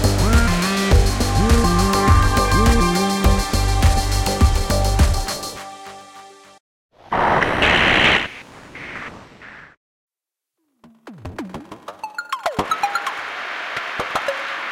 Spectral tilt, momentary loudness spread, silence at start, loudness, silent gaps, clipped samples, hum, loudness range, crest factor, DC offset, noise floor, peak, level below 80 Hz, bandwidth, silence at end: -4.5 dB/octave; 20 LU; 0 s; -18 LUFS; 6.60-6.89 s, 9.77-10.08 s; under 0.1%; none; 18 LU; 18 dB; under 0.1%; -86 dBFS; 0 dBFS; -24 dBFS; 17 kHz; 0 s